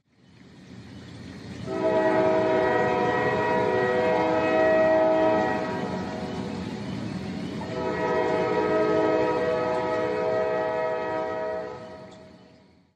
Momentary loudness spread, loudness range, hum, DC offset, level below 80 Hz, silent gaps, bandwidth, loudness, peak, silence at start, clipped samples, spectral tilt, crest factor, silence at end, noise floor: 16 LU; 6 LU; none; under 0.1%; -56 dBFS; none; 9.2 kHz; -25 LUFS; -10 dBFS; 0.45 s; under 0.1%; -6.5 dB/octave; 16 dB; 0.6 s; -55 dBFS